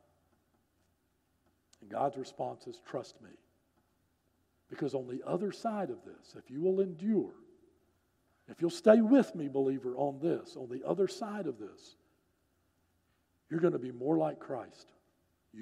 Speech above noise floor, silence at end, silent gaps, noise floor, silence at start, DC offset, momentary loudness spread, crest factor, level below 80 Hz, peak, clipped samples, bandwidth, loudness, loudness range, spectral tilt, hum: 43 dB; 0 s; none; -76 dBFS; 1.8 s; under 0.1%; 18 LU; 26 dB; -84 dBFS; -10 dBFS; under 0.1%; 12 kHz; -33 LUFS; 12 LU; -7 dB/octave; none